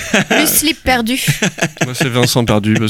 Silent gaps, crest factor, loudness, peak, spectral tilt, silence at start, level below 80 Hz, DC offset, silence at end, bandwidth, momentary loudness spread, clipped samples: none; 14 dB; -13 LUFS; 0 dBFS; -3.5 dB/octave; 0 s; -36 dBFS; under 0.1%; 0 s; 18 kHz; 6 LU; under 0.1%